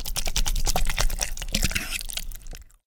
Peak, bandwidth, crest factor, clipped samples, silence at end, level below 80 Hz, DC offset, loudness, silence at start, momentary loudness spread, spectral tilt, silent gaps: -2 dBFS; 19 kHz; 22 dB; under 0.1%; 0.25 s; -28 dBFS; under 0.1%; -27 LUFS; 0 s; 12 LU; -2 dB/octave; none